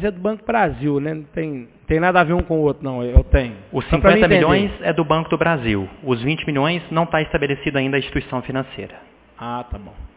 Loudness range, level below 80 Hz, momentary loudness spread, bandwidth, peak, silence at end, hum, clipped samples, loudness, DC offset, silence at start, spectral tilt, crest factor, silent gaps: 5 LU; -28 dBFS; 14 LU; 4 kHz; 0 dBFS; 0.1 s; none; under 0.1%; -19 LUFS; under 0.1%; 0 s; -10.5 dB/octave; 18 dB; none